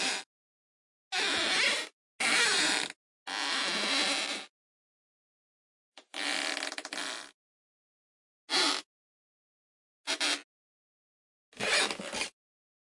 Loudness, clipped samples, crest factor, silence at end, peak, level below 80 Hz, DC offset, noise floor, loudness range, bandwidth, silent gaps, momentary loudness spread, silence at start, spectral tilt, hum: -30 LUFS; under 0.1%; 22 dB; 0.55 s; -12 dBFS; -76 dBFS; under 0.1%; under -90 dBFS; 9 LU; 11.5 kHz; 0.26-1.11 s, 1.93-2.19 s, 2.96-3.26 s, 4.49-5.92 s, 7.34-8.48 s, 8.86-10.04 s, 10.44-11.52 s; 12 LU; 0 s; 0.5 dB/octave; none